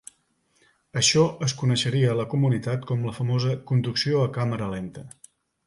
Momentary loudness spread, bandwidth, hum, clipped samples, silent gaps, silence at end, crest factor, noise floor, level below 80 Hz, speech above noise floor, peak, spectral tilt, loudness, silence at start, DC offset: 11 LU; 11.5 kHz; none; under 0.1%; none; 0.55 s; 16 dB; -68 dBFS; -58 dBFS; 44 dB; -8 dBFS; -5 dB/octave; -24 LUFS; 0.95 s; under 0.1%